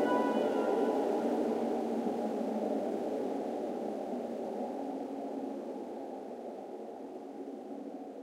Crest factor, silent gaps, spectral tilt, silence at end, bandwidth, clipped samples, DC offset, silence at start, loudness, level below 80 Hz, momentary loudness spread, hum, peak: 16 dB; none; -6.5 dB/octave; 0 s; 16 kHz; under 0.1%; under 0.1%; 0 s; -36 LUFS; -80 dBFS; 13 LU; none; -18 dBFS